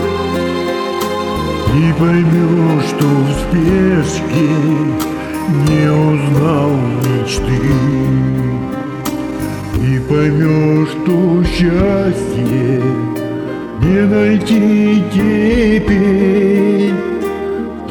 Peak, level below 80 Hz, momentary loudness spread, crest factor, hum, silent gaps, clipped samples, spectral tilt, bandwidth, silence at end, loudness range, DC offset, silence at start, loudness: 0 dBFS; -30 dBFS; 8 LU; 12 dB; none; none; under 0.1%; -7 dB/octave; over 20 kHz; 0 s; 3 LU; under 0.1%; 0 s; -14 LUFS